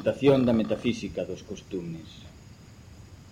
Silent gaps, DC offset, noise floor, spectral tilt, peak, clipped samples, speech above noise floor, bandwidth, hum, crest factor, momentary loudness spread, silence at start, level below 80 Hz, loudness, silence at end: none; under 0.1%; -49 dBFS; -7 dB/octave; -8 dBFS; under 0.1%; 22 dB; 11.5 kHz; none; 20 dB; 25 LU; 0 s; -52 dBFS; -27 LUFS; 0 s